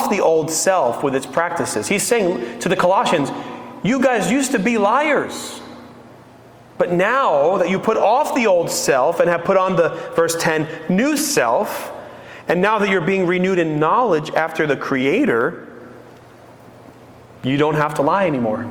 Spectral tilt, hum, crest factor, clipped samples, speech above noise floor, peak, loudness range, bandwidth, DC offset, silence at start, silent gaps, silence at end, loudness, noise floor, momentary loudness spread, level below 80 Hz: -4.5 dB/octave; none; 16 dB; under 0.1%; 27 dB; -2 dBFS; 5 LU; over 20 kHz; under 0.1%; 0 s; none; 0 s; -18 LUFS; -44 dBFS; 9 LU; -56 dBFS